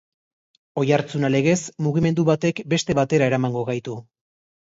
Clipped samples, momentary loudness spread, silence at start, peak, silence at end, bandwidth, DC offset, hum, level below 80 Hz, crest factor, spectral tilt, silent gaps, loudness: under 0.1%; 9 LU; 0.75 s; -4 dBFS; 0.65 s; 8 kHz; under 0.1%; none; -56 dBFS; 18 dB; -6 dB/octave; none; -21 LUFS